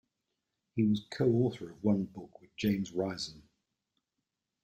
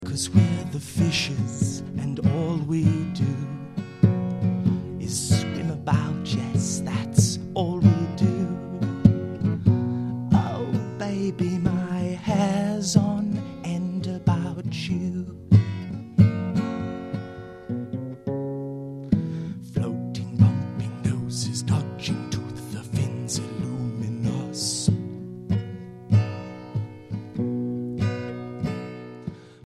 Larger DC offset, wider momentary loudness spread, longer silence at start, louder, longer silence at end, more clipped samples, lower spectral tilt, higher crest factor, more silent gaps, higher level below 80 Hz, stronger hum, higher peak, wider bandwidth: neither; about the same, 12 LU vs 12 LU; first, 0.75 s vs 0 s; second, -33 LUFS vs -25 LUFS; first, 1.25 s vs 0.1 s; neither; about the same, -7 dB/octave vs -6 dB/octave; about the same, 18 dB vs 22 dB; neither; second, -66 dBFS vs -48 dBFS; neither; second, -16 dBFS vs -2 dBFS; first, 15.5 kHz vs 13 kHz